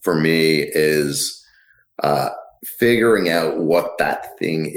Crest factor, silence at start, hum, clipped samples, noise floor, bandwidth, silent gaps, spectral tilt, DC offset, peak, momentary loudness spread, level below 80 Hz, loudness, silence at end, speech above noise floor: 16 dB; 0 s; none; under 0.1%; -56 dBFS; 19 kHz; none; -4.5 dB/octave; under 0.1%; -2 dBFS; 9 LU; -54 dBFS; -18 LUFS; 0 s; 38 dB